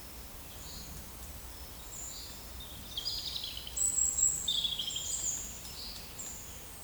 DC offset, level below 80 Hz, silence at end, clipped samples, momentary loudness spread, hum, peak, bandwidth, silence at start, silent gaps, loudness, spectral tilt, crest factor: under 0.1%; -52 dBFS; 0 s; under 0.1%; 17 LU; none; -16 dBFS; over 20 kHz; 0 s; none; -34 LUFS; 0 dB/octave; 22 dB